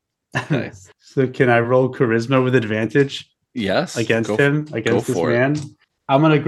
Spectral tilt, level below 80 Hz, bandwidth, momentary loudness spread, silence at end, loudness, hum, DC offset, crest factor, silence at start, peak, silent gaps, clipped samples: -6.5 dB/octave; -60 dBFS; 12.5 kHz; 11 LU; 0 s; -19 LUFS; none; under 0.1%; 18 dB; 0.35 s; 0 dBFS; none; under 0.1%